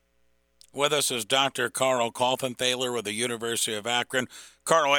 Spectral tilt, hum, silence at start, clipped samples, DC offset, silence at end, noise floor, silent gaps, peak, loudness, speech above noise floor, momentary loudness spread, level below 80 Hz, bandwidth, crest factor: -2 dB/octave; none; 0.75 s; under 0.1%; under 0.1%; 0 s; -68 dBFS; none; -4 dBFS; -26 LUFS; 42 dB; 6 LU; -72 dBFS; 19 kHz; 22 dB